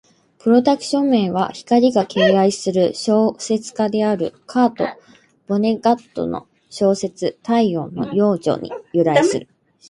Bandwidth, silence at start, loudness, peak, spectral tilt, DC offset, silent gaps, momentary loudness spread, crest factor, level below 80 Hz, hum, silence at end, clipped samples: 11 kHz; 0.45 s; -18 LUFS; -2 dBFS; -5.5 dB/octave; under 0.1%; none; 10 LU; 16 dB; -60 dBFS; none; 0.45 s; under 0.1%